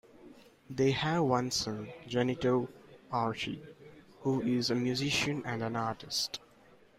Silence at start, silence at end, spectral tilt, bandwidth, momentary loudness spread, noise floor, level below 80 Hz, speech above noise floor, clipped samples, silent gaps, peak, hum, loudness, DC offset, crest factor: 0.2 s; 0.6 s; -4.5 dB/octave; 16 kHz; 11 LU; -60 dBFS; -64 dBFS; 29 dB; under 0.1%; none; -14 dBFS; none; -32 LUFS; under 0.1%; 20 dB